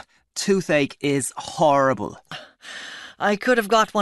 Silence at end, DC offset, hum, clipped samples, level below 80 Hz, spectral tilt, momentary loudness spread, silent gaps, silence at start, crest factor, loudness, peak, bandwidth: 0 s; under 0.1%; none; under 0.1%; -60 dBFS; -4 dB/octave; 19 LU; none; 0.35 s; 18 dB; -21 LUFS; -4 dBFS; 12.5 kHz